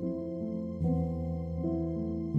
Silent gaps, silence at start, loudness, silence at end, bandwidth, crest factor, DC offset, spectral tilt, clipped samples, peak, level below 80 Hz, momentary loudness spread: none; 0 s; -34 LUFS; 0 s; 5.6 kHz; 14 dB; under 0.1%; -12 dB/octave; under 0.1%; -18 dBFS; -46 dBFS; 5 LU